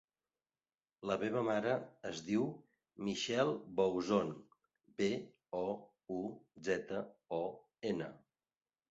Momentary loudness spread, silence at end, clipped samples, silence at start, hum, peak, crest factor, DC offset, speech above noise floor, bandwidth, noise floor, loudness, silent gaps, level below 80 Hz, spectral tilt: 11 LU; 0.75 s; under 0.1%; 1 s; none; -20 dBFS; 20 dB; under 0.1%; over 52 dB; 8 kHz; under -90 dBFS; -39 LUFS; none; -74 dBFS; -4.5 dB/octave